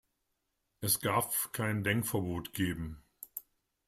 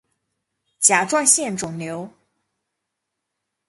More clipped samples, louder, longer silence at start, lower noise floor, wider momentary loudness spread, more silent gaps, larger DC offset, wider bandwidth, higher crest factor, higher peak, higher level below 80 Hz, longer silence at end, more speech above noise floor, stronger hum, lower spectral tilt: neither; second, -33 LUFS vs -17 LUFS; about the same, 0.8 s vs 0.8 s; about the same, -82 dBFS vs -80 dBFS; about the same, 15 LU vs 15 LU; neither; neither; first, 16 kHz vs 12 kHz; about the same, 20 dB vs 24 dB; second, -16 dBFS vs 0 dBFS; first, -60 dBFS vs -66 dBFS; second, 0.45 s vs 1.6 s; second, 49 dB vs 60 dB; neither; first, -4 dB/octave vs -2 dB/octave